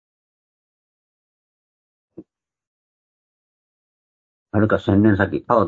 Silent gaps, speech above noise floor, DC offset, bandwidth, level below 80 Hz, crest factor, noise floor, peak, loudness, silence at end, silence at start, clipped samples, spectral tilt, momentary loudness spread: 2.67-4.46 s; 29 dB; under 0.1%; 7.2 kHz; -56 dBFS; 22 dB; -46 dBFS; -2 dBFS; -18 LUFS; 0 s; 2.2 s; under 0.1%; -9.5 dB/octave; 5 LU